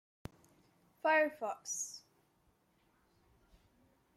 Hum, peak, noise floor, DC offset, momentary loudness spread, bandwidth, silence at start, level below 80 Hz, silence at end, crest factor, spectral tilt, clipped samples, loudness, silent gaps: none; -20 dBFS; -74 dBFS; under 0.1%; 24 LU; 15.5 kHz; 1.05 s; -72 dBFS; 2.2 s; 22 dB; -2 dB/octave; under 0.1%; -35 LUFS; none